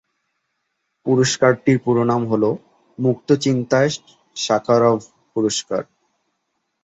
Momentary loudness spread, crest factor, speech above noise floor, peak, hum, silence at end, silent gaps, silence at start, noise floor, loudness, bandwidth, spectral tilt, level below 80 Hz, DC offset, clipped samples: 11 LU; 18 dB; 56 dB; -2 dBFS; none; 1 s; none; 1.05 s; -74 dBFS; -19 LUFS; 8.4 kHz; -5 dB/octave; -60 dBFS; under 0.1%; under 0.1%